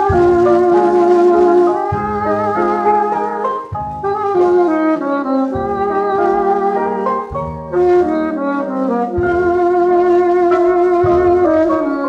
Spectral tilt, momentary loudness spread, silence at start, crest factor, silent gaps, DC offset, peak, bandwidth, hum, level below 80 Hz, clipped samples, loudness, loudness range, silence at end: -8.5 dB/octave; 7 LU; 0 s; 12 dB; none; under 0.1%; 0 dBFS; 6.6 kHz; none; -40 dBFS; under 0.1%; -14 LUFS; 3 LU; 0 s